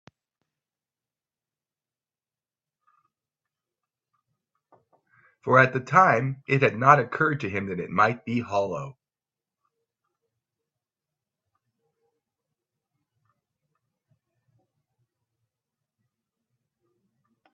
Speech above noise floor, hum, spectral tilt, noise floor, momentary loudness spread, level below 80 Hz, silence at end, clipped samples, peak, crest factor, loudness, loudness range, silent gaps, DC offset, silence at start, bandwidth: over 68 dB; none; -7 dB/octave; under -90 dBFS; 12 LU; -70 dBFS; 8.6 s; under 0.1%; -2 dBFS; 28 dB; -22 LUFS; 12 LU; none; under 0.1%; 5.45 s; 7.8 kHz